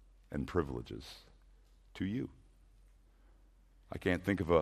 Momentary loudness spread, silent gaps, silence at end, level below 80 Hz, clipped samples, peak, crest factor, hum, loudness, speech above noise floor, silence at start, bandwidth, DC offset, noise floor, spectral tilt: 17 LU; none; 0 s; -56 dBFS; under 0.1%; -14 dBFS; 24 dB; none; -38 LUFS; 28 dB; 0.3 s; 14.5 kHz; under 0.1%; -64 dBFS; -7 dB/octave